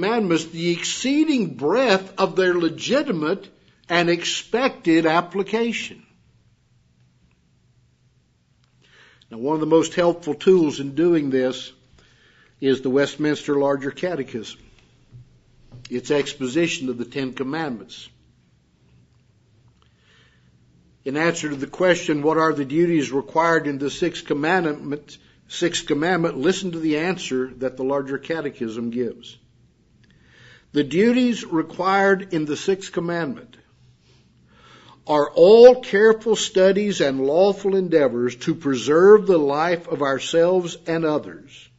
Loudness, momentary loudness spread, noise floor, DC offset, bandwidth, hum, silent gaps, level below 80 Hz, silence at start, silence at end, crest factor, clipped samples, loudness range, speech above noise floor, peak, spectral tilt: -20 LUFS; 11 LU; -62 dBFS; under 0.1%; 8 kHz; none; none; -62 dBFS; 0 s; 0.2 s; 20 dB; under 0.1%; 11 LU; 42 dB; 0 dBFS; -5 dB/octave